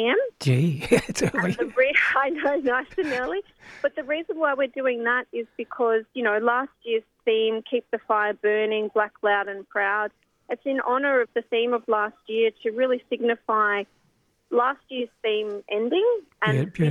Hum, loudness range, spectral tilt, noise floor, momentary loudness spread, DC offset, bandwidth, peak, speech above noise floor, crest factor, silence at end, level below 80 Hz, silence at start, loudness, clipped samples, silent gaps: none; 2 LU; -5.5 dB/octave; -66 dBFS; 7 LU; under 0.1%; 14 kHz; -4 dBFS; 42 dB; 20 dB; 0 s; -60 dBFS; 0 s; -24 LUFS; under 0.1%; none